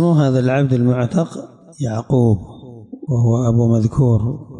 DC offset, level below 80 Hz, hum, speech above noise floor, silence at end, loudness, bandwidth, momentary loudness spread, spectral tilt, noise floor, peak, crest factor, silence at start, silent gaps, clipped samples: under 0.1%; -44 dBFS; none; 20 dB; 0 s; -17 LUFS; 9.4 kHz; 12 LU; -8.5 dB/octave; -36 dBFS; -6 dBFS; 12 dB; 0 s; none; under 0.1%